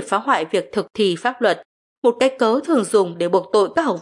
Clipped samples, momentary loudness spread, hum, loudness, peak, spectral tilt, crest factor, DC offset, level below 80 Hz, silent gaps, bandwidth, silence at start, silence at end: under 0.1%; 4 LU; none; -19 LUFS; -4 dBFS; -4.5 dB/octave; 14 dB; under 0.1%; -68 dBFS; 1.65-2.02 s; 11.5 kHz; 0 s; 0 s